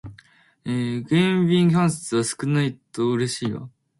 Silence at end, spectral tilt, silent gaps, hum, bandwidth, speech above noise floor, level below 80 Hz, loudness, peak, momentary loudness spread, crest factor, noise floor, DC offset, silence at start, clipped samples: 0.3 s; -6 dB/octave; none; none; 11.5 kHz; 33 dB; -58 dBFS; -22 LUFS; -8 dBFS; 10 LU; 16 dB; -54 dBFS; under 0.1%; 0.05 s; under 0.1%